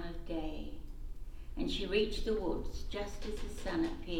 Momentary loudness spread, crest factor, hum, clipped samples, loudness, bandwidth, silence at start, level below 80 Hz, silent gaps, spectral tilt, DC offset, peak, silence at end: 17 LU; 18 dB; none; under 0.1%; -38 LUFS; 14.5 kHz; 0 s; -42 dBFS; none; -5.5 dB/octave; under 0.1%; -18 dBFS; 0 s